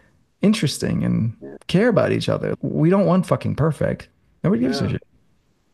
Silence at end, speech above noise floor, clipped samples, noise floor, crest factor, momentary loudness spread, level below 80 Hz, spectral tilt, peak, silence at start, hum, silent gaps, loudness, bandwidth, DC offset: 0.75 s; 43 dB; under 0.1%; -63 dBFS; 18 dB; 9 LU; -48 dBFS; -7 dB/octave; -2 dBFS; 0.4 s; none; none; -20 LUFS; 12.5 kHz; under 0.1%